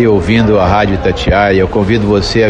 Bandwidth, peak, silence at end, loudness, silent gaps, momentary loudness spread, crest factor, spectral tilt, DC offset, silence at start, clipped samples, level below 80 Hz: 10 kHz; 0 dBFS; 0 s; -10 LUFS; none; 2 LU; 10 dB; -6.5 dB/octave; under 0.1%; 0 s; under 0.1%; -24 dBFS